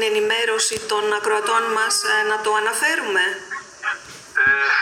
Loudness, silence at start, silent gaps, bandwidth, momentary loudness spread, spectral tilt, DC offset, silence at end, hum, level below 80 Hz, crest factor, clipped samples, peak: -19 LUFS; 0 s; none; 17 kHz; 10 LU; 0 dB/octave; under 0.1%; 0 s; none; -62 dBFS; 14 dB; under 0.1%; -6 dBFS